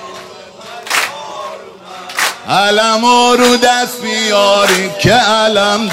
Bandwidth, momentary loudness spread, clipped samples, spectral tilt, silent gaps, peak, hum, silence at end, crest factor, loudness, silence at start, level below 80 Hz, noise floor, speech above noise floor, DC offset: 16.5 kHz; 21 LU; under 0.1%; -3 dB/octave; none; 0 dBFS; none; 0 s; 12 dB; -11 LUFS; 0 s; -48 dBFS; -32 dBFS; 22 dB; under 0.1%